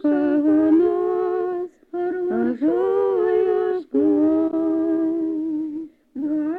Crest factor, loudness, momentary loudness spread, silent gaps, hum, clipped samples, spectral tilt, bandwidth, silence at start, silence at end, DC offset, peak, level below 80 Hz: 12 dB; -21 LUFS; 10 LU; none; none; under 0.1%; -9 dB/octave; 4.1 kHz; 0.05 s; 0 s; under 0.1%; -8 dBFS; -60 dBFS